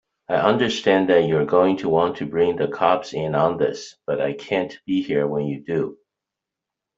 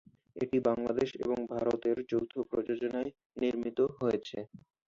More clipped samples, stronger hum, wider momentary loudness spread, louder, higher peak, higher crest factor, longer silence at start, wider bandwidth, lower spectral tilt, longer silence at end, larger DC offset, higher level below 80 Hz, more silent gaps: neither; neither; second, 7 LU vs 10 LU; first, -21 LUFS vs -33 LUFS; first, -2 dBFS vs -16 dBFS; about the same, 18 dB vs 18 dB; about the same, 0.3 s vs 0.35 s; about the same, 7.8 kHz vs 7.4 kHz; about the same, -6 dB/octave vs -7 dB/octave; first, 1.05 s vs 0.3 s; neither; first, -60 dBFS vs -66 dBFS; second, none vs 3.26-3.30 s